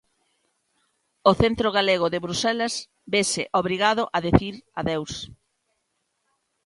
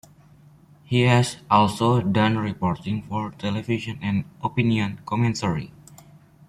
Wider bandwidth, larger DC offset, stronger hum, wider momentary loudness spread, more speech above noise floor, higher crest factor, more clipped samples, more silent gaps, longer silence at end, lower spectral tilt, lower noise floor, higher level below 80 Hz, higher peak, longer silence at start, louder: second, 11.5 kHz vs 13.5 kHz; neither; neither; about the same, 11 LU vs 9 LU; first, 52 dB vs 29 dB; about the same, 24 dB vs 20 dB; neither; neither; first, 1.4 s vs 0.55 s; second, -4 dB/octave vs -6.5 dB/octave; first, -75 dBFS vs -52 dBFS; first, -44 dBFS vs -54 dBFS; first, 0 dBFS vs -4 dBFS; first, 1.25 s vs 0.9 s; about the same, -23 LUFS vs -23 LUFS